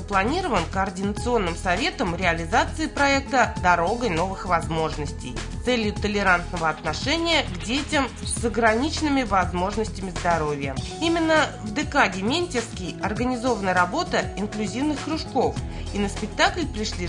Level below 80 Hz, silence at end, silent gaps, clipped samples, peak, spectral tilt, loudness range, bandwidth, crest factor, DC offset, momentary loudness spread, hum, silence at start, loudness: -38 dBFS; 0 s; none; under 0.1%; -4 dBFS; -4.5 dB/octave; 2 LU; 11 kHz; 20 dB; under 0.1%; 8 LU; none; 0 s; -24 LUFS